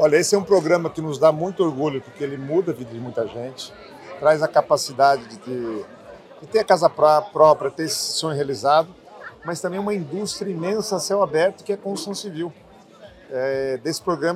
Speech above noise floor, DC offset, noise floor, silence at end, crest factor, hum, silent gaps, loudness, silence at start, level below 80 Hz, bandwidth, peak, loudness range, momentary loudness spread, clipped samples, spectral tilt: 25 dB; under 0.1%; -46 dBFS; 0 s; 20 dB; none; none; -21 LUFS; 0 s; -62 dBFS; 15 kHz; -2 dBFS; 6 LU; 15 LU; under 0.1%; -4.5 dB/octave